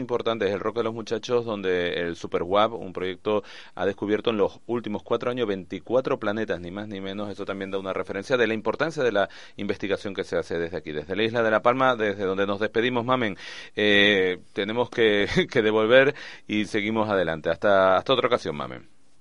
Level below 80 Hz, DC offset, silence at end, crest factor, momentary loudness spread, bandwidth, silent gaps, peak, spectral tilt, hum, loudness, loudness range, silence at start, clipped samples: -54 dBFS; 0.4%; 0.4 s; 20 dB; 12 LU; 11 kHz; none; -4 dBFS; -5.5 dB/octave; none; -25 LUFS; 6 LU; 0 s; under 0.1%